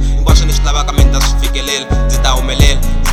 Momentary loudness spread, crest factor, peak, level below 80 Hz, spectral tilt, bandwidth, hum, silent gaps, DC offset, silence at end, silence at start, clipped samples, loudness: 4 LU; 10 dB; 0 dBFS; -12 dBFS; -4 dB/octave; 15 kHz; none; none; 0.7%; 0 s; 0 s; 0.6%; -13 LUFS